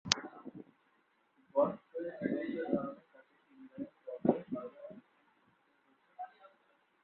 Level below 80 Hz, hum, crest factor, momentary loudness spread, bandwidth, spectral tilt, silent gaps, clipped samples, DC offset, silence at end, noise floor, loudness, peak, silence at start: -76 dBFS; none; 38 dB; 20 LU; 4.8 kHz; -3.5 dB/octave; none; under 0.1%; under 0.1%; 0.55 s; -74 dBFS; -37 LUFS; -2 dBFS; 0.05 s